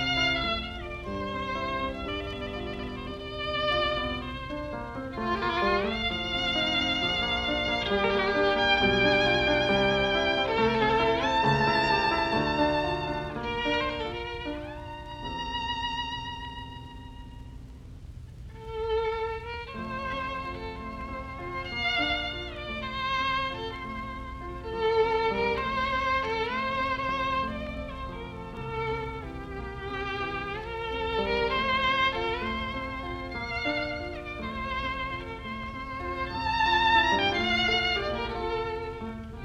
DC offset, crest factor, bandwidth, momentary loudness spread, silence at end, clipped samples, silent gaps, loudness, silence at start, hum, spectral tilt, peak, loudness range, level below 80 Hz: under 0.1%; 18 dB; 12.5 kHz; 14 LU; 0 s; under 0.1%; none; -28 LUFS; 0 s; none; -5 dB/octave; -10 dBFS; 10 LU; -44 dBFS